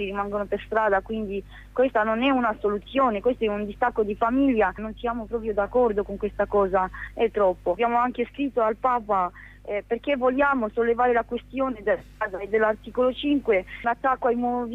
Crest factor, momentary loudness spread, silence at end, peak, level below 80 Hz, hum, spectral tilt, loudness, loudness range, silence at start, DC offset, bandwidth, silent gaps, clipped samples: 14 dB; 8 LU; 0 s; -12 dBFS; -46 dBFS; 50 Hz at -50 dBFS; -7.5 dB/octave; -24 LUFS; 1 LU; 0 s; under 0.1%; 7.4 kHz; none; under 0.1%